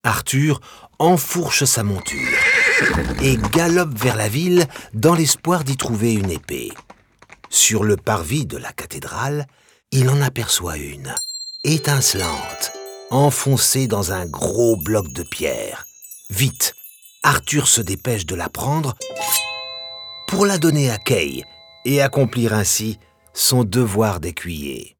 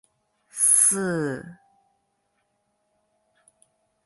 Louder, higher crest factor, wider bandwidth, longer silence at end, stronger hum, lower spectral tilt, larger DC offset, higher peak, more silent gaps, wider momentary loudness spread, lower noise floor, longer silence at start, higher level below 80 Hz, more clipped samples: about the same, -18 LUFS vs -19 LUFS; second, 18 dB vs 24 dB; first, over 20 kHz vs 12 kHz; second, 0.1 s vs 2.55 s; neither; about the same, -4 dB/octave vs -3 dB/octave; neither; first, 0 dBFS vs -4 dBFS; neither; second, 13 LU vs 21 LU; second, -49 dBFS vs -73 dBFS; second, 0.05 s vs 0.55 s; first, -42 dBFS vs -70 dBFS; neither